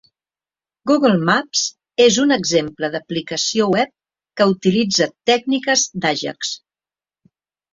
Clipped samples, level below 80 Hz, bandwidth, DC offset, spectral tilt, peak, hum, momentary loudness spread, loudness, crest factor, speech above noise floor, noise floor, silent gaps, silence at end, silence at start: under 0.1%; -60 dBFS; 7.8 kHz; under 0.1%; -3.5 dB/octave; -2 dBFS; none; 10 LU; -17 LUFS; 18 dB; over 73 dB; under -90 dBFS; none; 1.15 s; 0.85 s